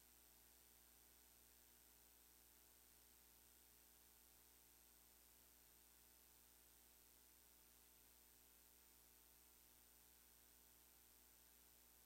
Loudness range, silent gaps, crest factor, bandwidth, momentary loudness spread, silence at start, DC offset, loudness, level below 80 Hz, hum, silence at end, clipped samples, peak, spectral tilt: 0 LU; none; 20 dB; 16 kHz; 0 LU; 0 s; under 0.1%; -68 LUFS; -82 dBFS; 60 Hz at -80 dBFS; 0 s; under 0.1%; -52 dBFS; -1.5 dB/octave